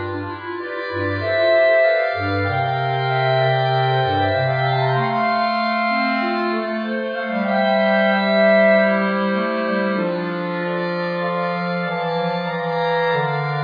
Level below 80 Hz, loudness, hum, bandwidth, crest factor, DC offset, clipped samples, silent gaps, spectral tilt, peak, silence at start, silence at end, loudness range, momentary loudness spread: -66 dBFS; -19 LUFS; none; 5.2 kHz; 14 dB; under 0.1%; under 0.1%; none; -8.5 dB/octave; -4 dBFS; 0 s; 0 s; 4 LU; 9 LU